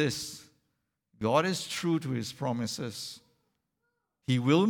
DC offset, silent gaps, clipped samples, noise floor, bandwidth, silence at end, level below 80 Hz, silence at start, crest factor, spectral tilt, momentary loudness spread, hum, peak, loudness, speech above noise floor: under 0.1%; none; under 0.1%; -81 dBFS; 18.5 kHz; 0 s; -70 dBFS; 0 s; 20 dB; -5 dB/octave; 15 LU; none; -10 dBFS; -31 LUFS; 52 dB